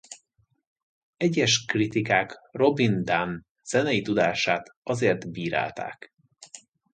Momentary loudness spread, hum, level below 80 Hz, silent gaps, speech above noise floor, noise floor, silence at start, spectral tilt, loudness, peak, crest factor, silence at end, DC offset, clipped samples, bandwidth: 20 LU; none; -62 dBFS; 0.67-0.76 s, 0.82-1.13 s, 3.50-3.55 s, 4.77-4.82 s; 44 dB; -69 dBFS; 0.1 s; -4.5 dB/octave; -25 LUFS; -6 dBFS; 20 dB; 0.35 s; under 0.1%; under 0.1%; 9.4 kHz